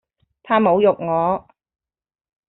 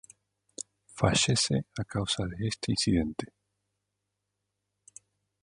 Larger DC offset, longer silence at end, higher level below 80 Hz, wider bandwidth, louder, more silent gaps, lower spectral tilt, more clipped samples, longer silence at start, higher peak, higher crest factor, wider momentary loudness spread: neither; second, 1.1 s vs 2.15 s; second, -60 dBFS vs -50 dBFS; second, 4.1 kHz vs 11.5 kHz; first, -18 LUFS vs -28 LUFS; neither; about the same, -5 dB/octave vs -4 dB/octave; neither; second, 0.45 s vs 0.6 s; about the same, -4 dBFS vs -6 dBFS; second, 18 dB vs 26 dB; second, 7 LU vs 18 LU